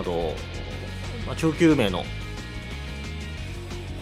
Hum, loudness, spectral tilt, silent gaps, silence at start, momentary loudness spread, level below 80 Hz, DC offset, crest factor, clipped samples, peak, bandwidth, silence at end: none; -28 LUFS; -6 dB/octave; none; 0 s; 15 LU; -38 dBFS; under 0.1%; 20 dB; under 0.1%; -6 dBFS; 14 kHz; 0 s